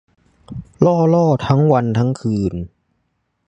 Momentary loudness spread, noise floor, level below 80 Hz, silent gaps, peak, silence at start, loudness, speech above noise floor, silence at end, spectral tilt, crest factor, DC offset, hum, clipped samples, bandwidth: 20 LU; -69 dBFS; -44 dBFS; none; 0 dBFS; 0.5 s; -16 LUFS; 54 dB; 0.8 s; -8.5 dB/octave; 16 dB; under 0.1%; none; under 0.1%; 8.6 kHz